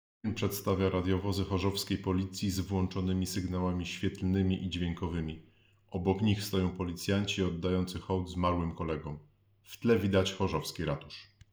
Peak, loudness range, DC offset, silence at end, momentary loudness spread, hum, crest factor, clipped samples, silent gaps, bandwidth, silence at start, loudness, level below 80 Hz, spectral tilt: -16 dBFS; 1 LU; under 0.1%; 0.25 s; 8 LU; none; 18 dB; under 0.1%; none; over 20 kHz; 0.25 s; -33 LUFS; -56 dBFS; -6 dB/octave